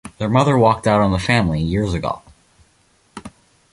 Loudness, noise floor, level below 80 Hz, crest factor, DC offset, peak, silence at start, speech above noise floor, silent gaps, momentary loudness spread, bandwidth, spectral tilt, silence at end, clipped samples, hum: -17 LUFS; -58 dBFS; -36 dBFS; 18 dB; under 0.1%; -2 dBFS; 0.05 s; 41 dB; none; 21 LU; 11.5 kHz; -6.5 dB/octave; 0.45 s; under 0.1%; none